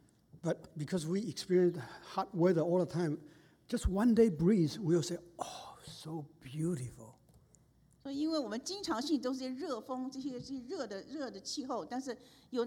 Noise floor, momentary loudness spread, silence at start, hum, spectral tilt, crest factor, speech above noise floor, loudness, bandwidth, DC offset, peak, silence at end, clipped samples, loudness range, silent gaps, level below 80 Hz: -67 dBFS; 15 LU; 0.35 s; none; -6 dB/octave; 20 dB; 32 dB; -35 LUFS; 16.5 kHz; under 0.1%; -16 dBFS; 0 s; under 0.1%; 9 LU; none; -54 dBFS